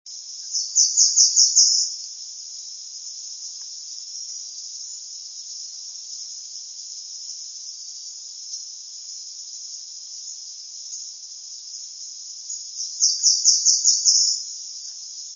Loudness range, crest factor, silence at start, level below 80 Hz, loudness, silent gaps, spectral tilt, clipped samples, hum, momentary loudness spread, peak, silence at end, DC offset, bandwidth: 15 LU; 24 dB; 0.05 s; under -90 dBFS; -17 LUFS; none; 10 dB/octave; under 0.1%; none; 19 LU; 0 dBFS; 0 s; under 0.1%; 7.6 kHz